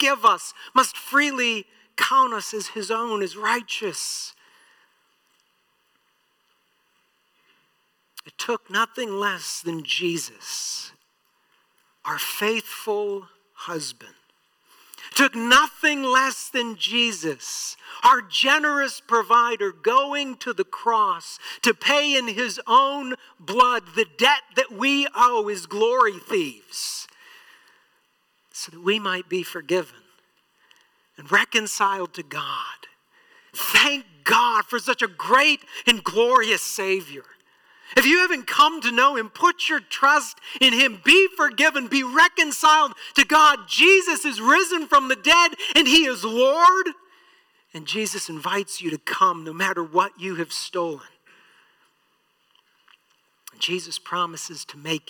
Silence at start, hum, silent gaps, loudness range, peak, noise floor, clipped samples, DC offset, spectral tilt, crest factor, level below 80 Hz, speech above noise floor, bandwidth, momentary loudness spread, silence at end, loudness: 0 s; none; none; 13 LU; -6 dBFS; -68 dBFS; under 0.1%; under 0.1%; -1.5 dB/octave; 16 dB; -64 dBFS; 47 dB; 19 kHz; 14 LU; 0.1 s; -20 LUFS